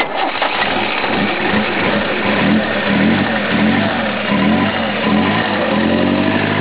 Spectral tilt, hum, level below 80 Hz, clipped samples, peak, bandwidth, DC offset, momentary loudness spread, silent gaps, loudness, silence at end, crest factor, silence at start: -9.5 dB/octave; none; -40 dBFS; under 0.1%; -2 dBFS; 4 kHz; under 0.1%; 3 LU; none; -15 LUFS; 0 s; 14 dB; 0 s